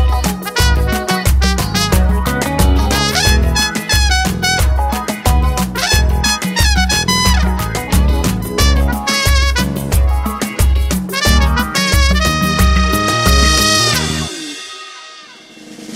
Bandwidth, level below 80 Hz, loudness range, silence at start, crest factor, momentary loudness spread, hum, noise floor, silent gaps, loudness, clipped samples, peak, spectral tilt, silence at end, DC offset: 16.5 kHz; -16 dBFS; 2 LU; 0 s; 14 dB; 6 LU; none; -37 dBFS; none; -13 LUFS; under 0.1%; 0 dBFS; -3.5 dB/octave; 0 s; under 0.1%